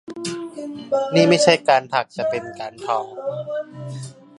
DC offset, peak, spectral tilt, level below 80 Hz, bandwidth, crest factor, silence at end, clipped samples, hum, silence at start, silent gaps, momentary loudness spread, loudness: under 0.1%; 0 dBFS; -4.5 dB/octave; -66 dBFS; 11.5 kHz; 20 dB; 0.25 s; under 0.1%; none; 0.1 s; none; 18 LU; -20 LUFS